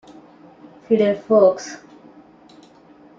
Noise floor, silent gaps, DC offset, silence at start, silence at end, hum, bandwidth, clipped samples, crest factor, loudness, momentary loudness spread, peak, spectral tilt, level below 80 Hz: -48 dBFS; none; under 0.1%; 0.9 s; 1.45 s; none; 7.6 kHz; under 0.1%; 20 dB; -17 LUFS; 20 LU; -2 dBFS; -6 dB/octave; -68 dBFS